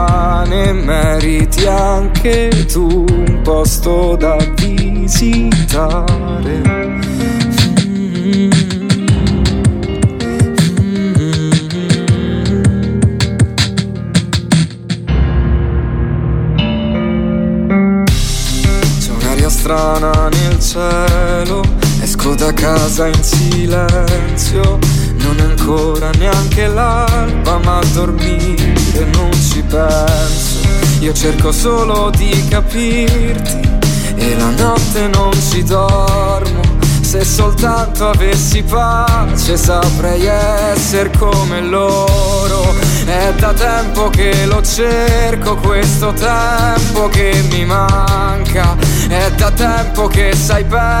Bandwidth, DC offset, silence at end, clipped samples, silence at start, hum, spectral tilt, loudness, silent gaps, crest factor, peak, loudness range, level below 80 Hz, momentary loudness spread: 16.5 kHz; under 0.1%; 0 s; under 0.1%; 0 s; none; -5 dB/octave; -13 LUFS; none; 10 dB; 0 dBFS; 1 LU; -16 dBFS; 3 LU